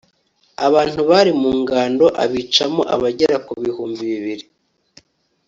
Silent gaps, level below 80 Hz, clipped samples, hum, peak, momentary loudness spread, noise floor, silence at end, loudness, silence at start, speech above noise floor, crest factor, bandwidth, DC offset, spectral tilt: none; -54 dBFS; under 0.1%; none; 0 dBFS; 11 LU; -61 dBFS; 1.05 s; -17 LUFS; 0.6 s; 44 dB; 18 dB; 7.8 kHz; under 0.1%; -4.5 dB/octave